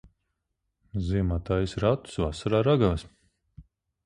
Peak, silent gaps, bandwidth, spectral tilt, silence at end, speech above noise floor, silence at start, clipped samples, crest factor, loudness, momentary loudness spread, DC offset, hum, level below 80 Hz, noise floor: -10 dBFS; none; 11 kHz; -7.5 dB/octave; 0.45 s; 55 dB; 0.95 s; under 0.1%; 20 dB; -27 LUFS; 10 LU; under 0.1%; none; -40 dBFS; -81 dBFS